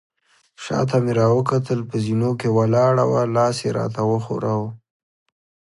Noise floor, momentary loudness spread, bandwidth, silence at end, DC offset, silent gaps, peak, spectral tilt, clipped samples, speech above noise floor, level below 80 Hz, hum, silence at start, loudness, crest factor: -55 dBFS; 7 LU; 11.5 kHz; 1 s; under 0.1%; none; -4 dBFS; -7.5 dB/octave; under 0.1%; 35 dB; -56 dBFS; none; 0.6 s; -20 LUFS; 16 dB